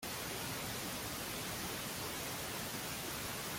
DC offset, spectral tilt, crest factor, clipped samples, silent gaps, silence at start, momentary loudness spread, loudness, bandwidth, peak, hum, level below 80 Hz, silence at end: under 0.1%; -2.5 dB/octave; 14 dB; under 0.1%; none; 0 s; 0 LU; -40 LUFS; 17 kHz; -30 dBFS; none; -62 dBFS; 0 s